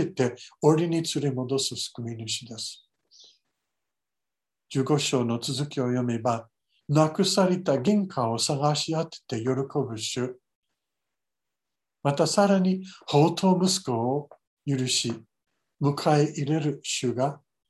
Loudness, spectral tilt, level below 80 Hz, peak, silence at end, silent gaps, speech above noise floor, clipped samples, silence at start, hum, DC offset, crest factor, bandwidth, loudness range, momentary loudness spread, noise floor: -26 LUFS; -5 dB/octave; -70 dBFS; -6 dBFS; 0.35 s; 10.55-10.63 s, 14.47-14.57 s; 64 dB; under 0.1%; 0 s; none; under 0.1%; 20 dB; 12.5 kHz; 7 LU; 10 LU; -89 dBFS